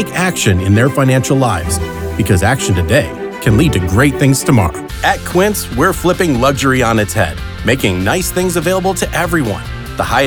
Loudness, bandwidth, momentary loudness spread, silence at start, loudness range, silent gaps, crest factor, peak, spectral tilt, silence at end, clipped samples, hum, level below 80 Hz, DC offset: -13 LUFS; over 20 kHz; 7 LU; 0 s; 1 LU; none; 12 dB; 0 dBFS; -5 dB/octave; 0 s; under 0.1%; none; -28 dBFS; under 0.1%